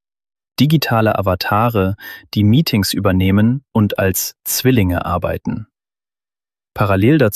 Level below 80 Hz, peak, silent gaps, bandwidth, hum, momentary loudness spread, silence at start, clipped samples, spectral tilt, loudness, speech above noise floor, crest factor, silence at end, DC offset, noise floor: -42 dBFS; -2 dBFS; none; 14.5 kHz; none; 10 LU; 0.6 s; under 0.1%; -5.5 dB/octave; -16 LUFS; over 75 dB; 14 dB; 0 s; under 0.1%; under -90 dBFS